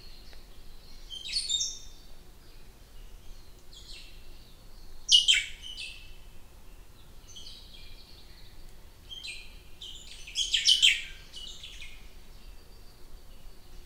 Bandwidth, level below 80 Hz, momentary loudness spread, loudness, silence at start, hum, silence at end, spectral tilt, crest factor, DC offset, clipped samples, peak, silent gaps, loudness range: 16 kHz; -48 dBFS; 28 LU; -25 LUFS; 0 s; none; 0 s; 1.5 dB/octave; 28 dB; under 0.1%; under 0.1%; -6 dBFS; none; 19 LU